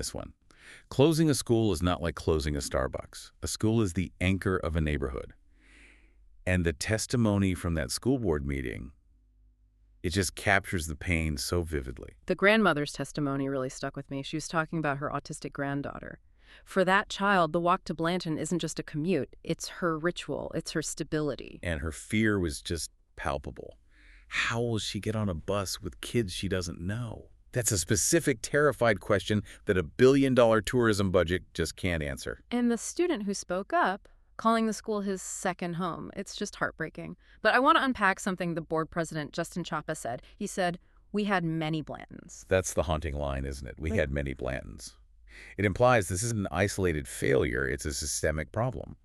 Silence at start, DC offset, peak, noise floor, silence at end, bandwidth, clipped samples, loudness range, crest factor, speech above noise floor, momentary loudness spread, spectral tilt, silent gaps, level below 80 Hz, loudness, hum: 0 s; under 0.1%; -8 dBFS; -63 dBFS; 0.1 s; 13.5 kHz; under 0.1%; 6 LU; 22 dB; 33 dB; 13 LU; -5 dB/octave; none; -46 dBFS; -29 LUFS; none